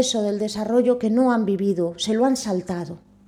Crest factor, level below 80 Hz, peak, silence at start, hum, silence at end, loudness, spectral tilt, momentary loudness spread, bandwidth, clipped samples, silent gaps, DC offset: 14 dB; -58 dBFS; -6 dBFS; 0 s; none; 0.3 s; -22 LUFS; -5 dB/octave; 8 LU; 14.5 kHz; under 0.1%; none; under 0.1%